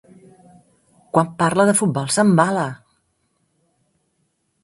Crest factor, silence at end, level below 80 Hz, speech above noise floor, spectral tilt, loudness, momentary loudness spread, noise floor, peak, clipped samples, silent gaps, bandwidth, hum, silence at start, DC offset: 20 dB; 1.9 s; -62 dBFS; 52 dB; -5 dB/octave; -18 LUFS; 9 LU; -69 dBFS; 0 dBFS; under 0.1%; none; 11.5 kHz; none; 1.15 s; under 0.1%